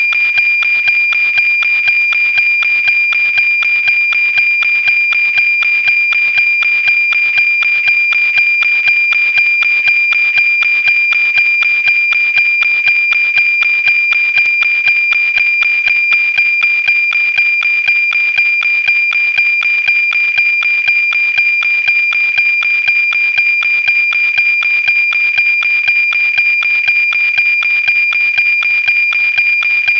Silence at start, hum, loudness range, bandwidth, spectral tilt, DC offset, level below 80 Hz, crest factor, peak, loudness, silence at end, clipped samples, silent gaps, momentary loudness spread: 0 s; none; 1 LU; 7.6 kHz; 0.5 dB/octave; under 0.1%; -56 dBFS; 8 dB; -2 dBFS; -8 LUFS; 0 s; under 0.1%; none; 1 LU